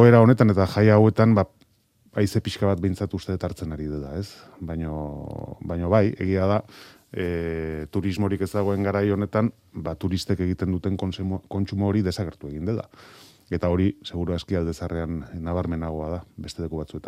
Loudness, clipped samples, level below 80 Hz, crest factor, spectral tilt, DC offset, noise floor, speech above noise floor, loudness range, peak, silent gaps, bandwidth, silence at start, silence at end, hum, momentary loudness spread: -24 LUFS; under 0.1%; -48 dBFS; 22 dB; -8 dB/octave; under 0.1%; -62 dBFS; 39 dB; 6 LU; -2 dBFS; none; 14 kHz; 0 s; 0 s; none; 15 LU